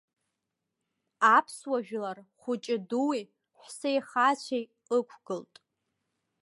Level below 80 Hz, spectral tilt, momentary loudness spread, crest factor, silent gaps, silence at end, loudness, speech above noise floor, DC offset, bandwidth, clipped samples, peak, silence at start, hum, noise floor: -88 dBFS; -4 dB/octave; 16 LU; 22 dB; none; 1 s; -29 LUFS; 56 dB; under 0.1%; 11.5 kHz; under 0.1%; -10 dBFS; 1.2 s; none; -85 dBFS